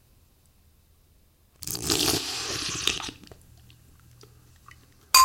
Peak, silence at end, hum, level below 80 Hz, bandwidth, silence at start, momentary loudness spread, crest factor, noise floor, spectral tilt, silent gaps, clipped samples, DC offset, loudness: -2 dBFS; 0 s; none; -54 dBFS; 17 kHz; 1.6 s; 15 LU; 28 dB; -61 dBFS; -1 dB/octave; none; under 0.1%; under 0.1%; -26 LUFS